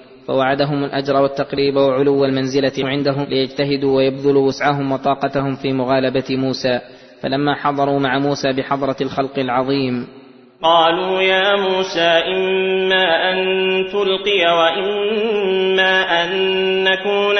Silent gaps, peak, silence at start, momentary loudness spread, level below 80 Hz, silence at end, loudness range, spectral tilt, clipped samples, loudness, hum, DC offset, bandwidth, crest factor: none; -2 dBFS; 0 s; 6 LU; -54 dBFS; 0 s; 4 LU; -5.5 dB/octave; under 0.1%; -17 LUFS; none; under 0.1%; 6.4 kHz; 16 dB